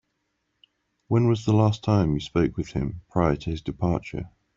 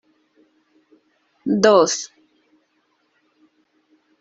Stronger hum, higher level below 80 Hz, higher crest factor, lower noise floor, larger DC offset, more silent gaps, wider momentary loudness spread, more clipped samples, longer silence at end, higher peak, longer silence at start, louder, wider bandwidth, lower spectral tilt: neither; first, -44 dBFS vs -68 dBFS; about the same, 18 dB vs 22 dB; first, -76 dBFS vs -66 dBFS; neither; neither; second, 9 LU vs 18 LU; neither; second, 0.3 s vs 2.15 s; second, -6 dBFS vs -2 dBFS; second, 1.1 s vs 1.45 s; second, -25 LUFS vs -17 LUFS; about the same, 7.6 kHz vs 8.2 kHz; first, -8 dB/octave vs -3.5 dB/octave